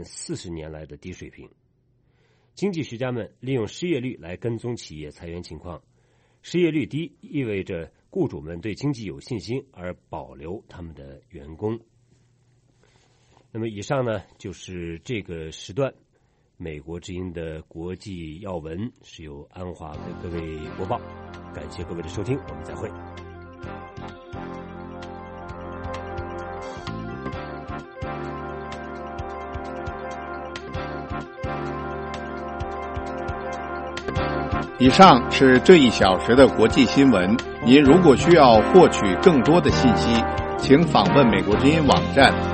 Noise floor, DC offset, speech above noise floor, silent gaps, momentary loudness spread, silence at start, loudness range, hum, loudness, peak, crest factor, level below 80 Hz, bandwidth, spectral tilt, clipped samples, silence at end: -63 dBFS; under 0.1%; 43 dB; none; 23 LU; 0 s; 19 LU; none; -20 LUFS; 0 dBFS; 22 dB; -42 dBFS; 8.8 kHz; -6 dB/octave; under 0.1%; 0 s